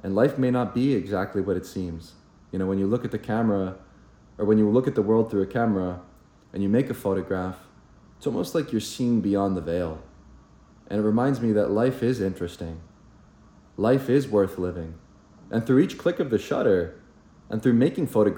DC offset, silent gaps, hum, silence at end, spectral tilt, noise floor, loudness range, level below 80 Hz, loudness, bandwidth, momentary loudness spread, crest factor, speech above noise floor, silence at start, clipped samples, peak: under 0.1%; none; none; 0 s; -7.5 dB/octave; -53 dBFS; 4 LU; -54 dBFS; -25 LUFS; 17 kHz; 13 LU; 18 dB; 29 dB; 0.05 s; under 0.1%; -6 dBFS